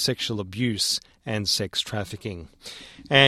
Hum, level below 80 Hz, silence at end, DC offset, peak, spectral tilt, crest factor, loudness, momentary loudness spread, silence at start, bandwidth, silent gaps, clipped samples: none; -56 dBFS; 0 s; under 0.1%; -2 dBFS; -3.5 dB/octave; 24 dB; -26 LUFS; 17 LU; 0 s; 16 kHz; none; under 0.1%